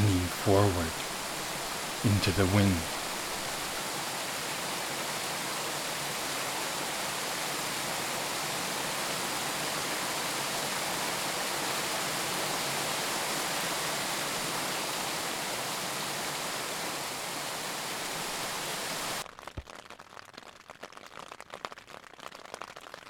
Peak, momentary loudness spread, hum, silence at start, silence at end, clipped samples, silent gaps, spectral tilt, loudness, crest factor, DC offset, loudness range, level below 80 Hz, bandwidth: -10 dBFS; 17 LU; none; 0 s; 0 s; under 0.1%; none; -3 dB/octave; -31 LUFS; 22 dB; under 0.1%; 7 LU; -56 dBFS; 19 kHz